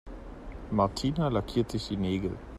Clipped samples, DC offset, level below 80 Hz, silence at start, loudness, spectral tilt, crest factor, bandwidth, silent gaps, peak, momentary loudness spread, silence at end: under 0.1%; under 0.1%; -44 dBFS; 0.05 s; -30 LUFS; -7 dB/octave; 18 dB; 13.5 kHz; none; -12 dBFS; 17 LU; 0 s